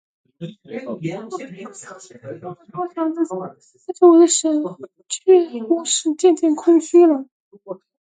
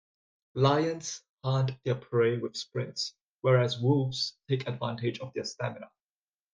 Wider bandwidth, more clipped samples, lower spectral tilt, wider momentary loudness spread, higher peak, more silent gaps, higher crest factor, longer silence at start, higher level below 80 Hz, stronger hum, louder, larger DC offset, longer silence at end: first, 9.4 kHz vs 7.6 kHz; neither; second, -4 dB/octave vs -6 dB/octave; first, 23 LU vs 11 LU; first, -2 dBFS vs -10 dBFS; about the same, 7.32-7.51 s vs 1.29-1.36 s, 3.29-3.38 s; about the same, 18 dB vs 20 dB; second, 0.4 s vs 0.55 s; second, -76 dBFS vs -68 dBFS; neither; first, -17 LUFS vs -30 LUFS; neither; second, 0.25 s vs 0.65 s